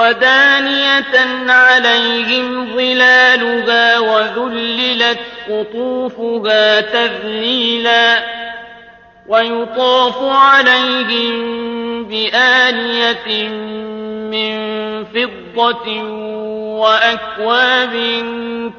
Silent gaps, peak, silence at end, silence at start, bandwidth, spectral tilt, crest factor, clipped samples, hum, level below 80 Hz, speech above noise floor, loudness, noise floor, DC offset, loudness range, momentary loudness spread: none; 0 dBFS; 0 s; 0 s; 7 kHz; -3 dB/octave; 14 dB; under 0.1%; none; -56 dBFS; 27 dB; -12 LUFS; -41 dBFS; under 0.1%; 6 LU; 14 LU